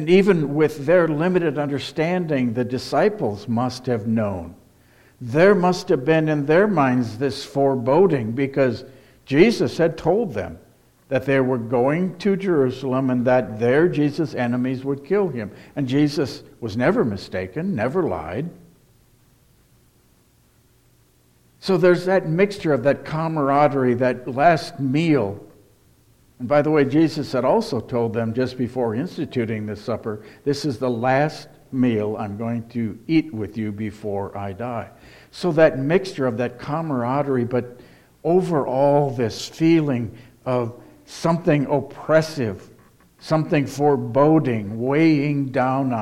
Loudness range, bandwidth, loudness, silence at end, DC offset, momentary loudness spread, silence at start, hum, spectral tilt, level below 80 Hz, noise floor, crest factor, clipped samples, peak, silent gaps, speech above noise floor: 5 LU; 15 kHz; -21 LUFS; 0 s; under 0.1%; 11 LU; 0 s; none; -7 dB/octave; -56 dBFS; -58 dBFS; 20 dB; under 0.1%; 0 dBFS; none; 38 dB